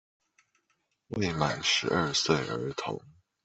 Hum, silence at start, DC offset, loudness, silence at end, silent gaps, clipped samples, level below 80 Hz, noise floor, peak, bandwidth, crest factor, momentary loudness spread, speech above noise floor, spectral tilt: none; 1.1 s; under 0.1%; -29 LUFS; 0.35 s; none; under 0.1%; -60 dBFS; -76 dBFS; -8 dBFS; 8.4 kHz; 24 dB; 12 LU; 47 dB; -3.5 dB/octave